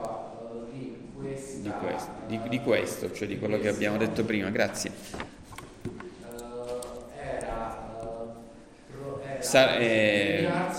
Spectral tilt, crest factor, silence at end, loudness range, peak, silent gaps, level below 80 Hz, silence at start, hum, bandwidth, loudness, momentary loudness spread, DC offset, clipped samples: -4.5 dB/octave; 22 dB; 0 s; 11 LU; -8 dBFS; none; -54 dBFS; 0 s; none; 16.5 kHz; -29 LUFS; 18 LU; under 0.1%; under 0.1%